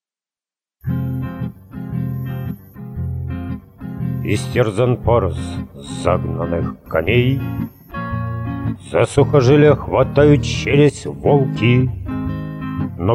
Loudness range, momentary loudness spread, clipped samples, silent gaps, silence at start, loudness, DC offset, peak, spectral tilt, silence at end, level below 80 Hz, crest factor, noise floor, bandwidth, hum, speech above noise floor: 11 LU; 15 LU; under 0.1%; none; 0.85 s; -18 LUFS; under 0.1%; 0 dBFS; -7 dB/octave; 0 s; -36 dBFS; 18 dB; under -90 dBFS; 13 kHz; none; over 75 dB